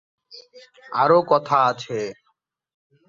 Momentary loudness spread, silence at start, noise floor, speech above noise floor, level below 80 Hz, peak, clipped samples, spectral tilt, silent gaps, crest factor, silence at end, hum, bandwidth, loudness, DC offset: 12 LU; 0.35 s; -70 dBFS; 50 dB; -68 dBFS; -4 dBFS; under 0.1%; -5.5 dB/octave; none; 20 dB; 0.95 s; none; 7.6 kHz; -20 LUFS; under 0.1%